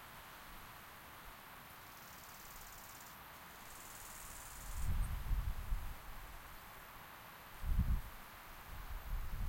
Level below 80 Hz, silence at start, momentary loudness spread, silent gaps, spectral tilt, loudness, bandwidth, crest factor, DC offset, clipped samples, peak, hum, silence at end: -46 dBFS; 0 s; 11 LU; none; -4.5 dB/octave; -48 LUFS; 16.5 kHz; 20 dB; under 0.1%; under 0.1%; -24 dBFS; none; 0 s